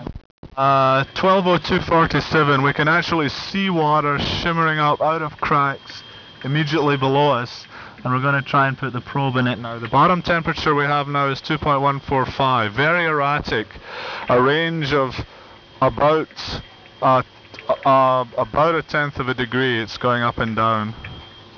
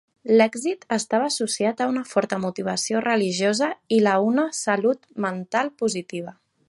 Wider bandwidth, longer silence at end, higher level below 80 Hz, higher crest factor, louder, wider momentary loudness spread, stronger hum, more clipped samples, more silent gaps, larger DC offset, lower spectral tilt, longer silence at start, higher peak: second, 5.4 kHz vs 11.5 kHz; second, 0.15 s vs 0.35 s; first, -44 dBFS vs -70 dBFS; about the same, 14 dB vs 18 dB; first, -19 LUFS vs -23 LUFS; first, 14 LU vs 9 LU; neither; neither; first, 0.25-0.43 s vs none; neither; first, -6.5 dB/octave vs -4 dB/octave; second, 0 s vs 0.25 s; about the same, -6 dBFS vs -4 dBFS